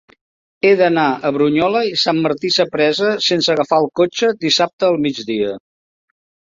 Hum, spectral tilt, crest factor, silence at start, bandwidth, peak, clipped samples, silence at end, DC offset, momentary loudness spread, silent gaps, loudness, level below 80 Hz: none; -4.5 dB/octave; 16 dB; 0.65 s; 7.6 kHz; -2 dBFS; under 0.1%; 0.9 s; under 0.1%; 6 LU; 4.73-4.79 s; -16 LUFS; -60 dBFS